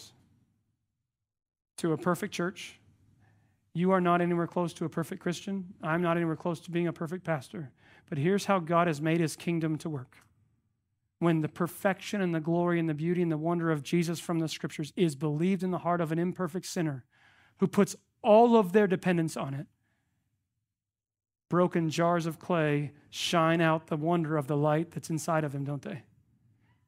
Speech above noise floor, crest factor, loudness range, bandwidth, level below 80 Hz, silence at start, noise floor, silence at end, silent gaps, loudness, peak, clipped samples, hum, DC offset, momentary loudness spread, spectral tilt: over 61 dB; 22 dB; 6 LU; 16 kHz; -72 dBFS; 0 s; under -90 dBFS; 0.85 s; none; -29 LUFS; -10 dBFS; under 0.1%; none; under 0.1%; 11 LU; -6.5 dB/octave